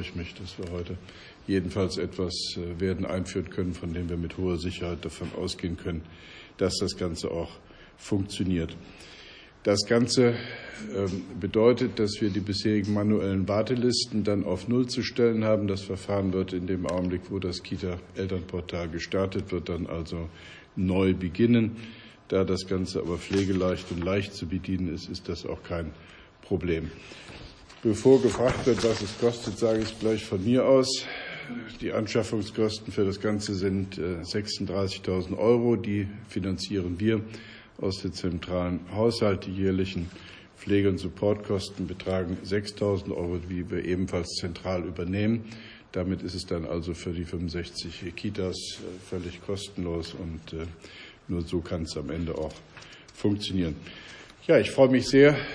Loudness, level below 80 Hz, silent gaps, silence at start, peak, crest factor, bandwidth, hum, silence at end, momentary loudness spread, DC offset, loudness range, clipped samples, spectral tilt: -28 LUFS; -50 dBFS; none; 0 s; -6 dBFS; 22 dB; 10.5 kHz; none; 0 s; 15 LU; under 0.1%; 7 LU; under 0.1%; -6 dB/octave